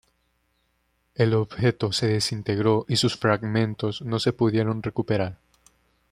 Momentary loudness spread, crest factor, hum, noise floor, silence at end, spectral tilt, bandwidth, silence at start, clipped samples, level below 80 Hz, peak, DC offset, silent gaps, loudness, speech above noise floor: 5 LU; 20 dB; none; -70 dBFS; 0.75 s; -5.5 dB/octave; 14.5 kHz; 1.2 s; under 0.1%; -58 dBFS; -6 dBFS; under 0.1%; none; -24 LUFS; 47 dB